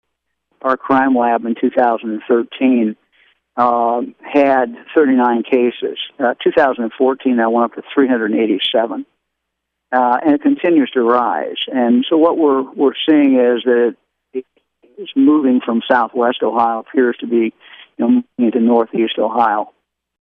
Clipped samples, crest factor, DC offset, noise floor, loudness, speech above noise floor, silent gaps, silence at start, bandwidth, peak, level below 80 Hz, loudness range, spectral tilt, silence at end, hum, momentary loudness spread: under 0.1%; 14 dB; under 0.1%; -76 dBFS; -15 LUFS; 62 dB; none; 0.65 s; 4.3 kHz; -2 dBFS; -64 dBFS; 2 LU; -7.5 dB/octave; 0.5 s; none; 8 LU